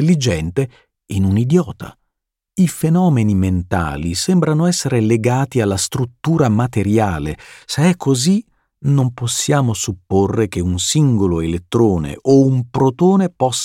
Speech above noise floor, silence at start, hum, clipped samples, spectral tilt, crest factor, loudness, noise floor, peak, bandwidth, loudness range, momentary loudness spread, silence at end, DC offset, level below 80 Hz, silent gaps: 61 dB; 0 s; none; under 0.1%; -6 dB/octave; 14 dB; -16 LUFS; -77 dBFS; -2 dBFS; 16.5 kHz; 2 LU; 7 LU; 0 s; under 0.1%; -40 dBFS; none